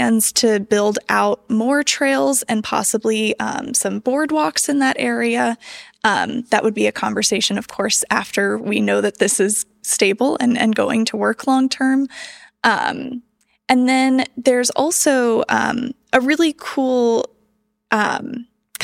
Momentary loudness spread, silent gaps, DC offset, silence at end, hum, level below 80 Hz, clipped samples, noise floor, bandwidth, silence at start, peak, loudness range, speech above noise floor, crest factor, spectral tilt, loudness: 7 LU; none; under 0.1%; 0 s; none; -62 dBFS; under 0.1%; -65 dBFS; 16.5 kHz; 0 s; 0 dBFS; 2 LU; 48 dB; 18 dB; -3 dB/octave; -17 LUFS